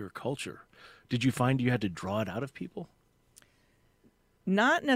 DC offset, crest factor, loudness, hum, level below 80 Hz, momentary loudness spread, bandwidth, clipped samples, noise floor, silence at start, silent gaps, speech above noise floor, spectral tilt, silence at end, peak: under 0.1%; 20 dB; -31 LUFS; none; -64 dBFS; 16 LU; 15.5 kHz; under 0.1%; -68 dBFS; 0 s; none; 38 dB; -6 dB/octave; 0 s; -12 dBFS